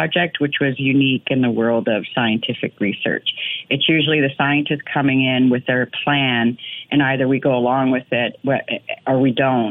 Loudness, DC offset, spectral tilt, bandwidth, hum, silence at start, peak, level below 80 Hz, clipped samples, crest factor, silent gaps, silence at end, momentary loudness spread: -18 LUFS; under 0.1%; -9 dB/octave; 4 kHz; none; 0 s; -4 dBFS; -62 dBFS; under 0.1%; 14 dB; none; 0 s; 6 LU